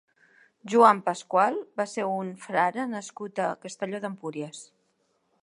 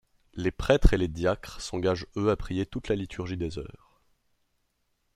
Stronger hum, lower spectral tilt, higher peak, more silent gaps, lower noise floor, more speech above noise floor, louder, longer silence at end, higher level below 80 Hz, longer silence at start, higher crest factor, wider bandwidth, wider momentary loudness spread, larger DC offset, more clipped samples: neither; about the same, -5 dB/octave vs -6 dB/octave; about the same, -4 dBFS vs -4 dBFS; neither; about the same, -72 dBFS vs -75 dBFS; about the same, 45 dB vs 48 dB; first, -26 LUFS vs -29 LUFS; second, 0.8 s vs 1.5 s; second, -82 dBFS vs -34 dBFS; first, 0.65 s vs 0.35 s; about the same, 24 dB vs 26 dB; second, 11 kHz vs 12.5 kHz; first, 16 LU vs 12 LU; neither; neither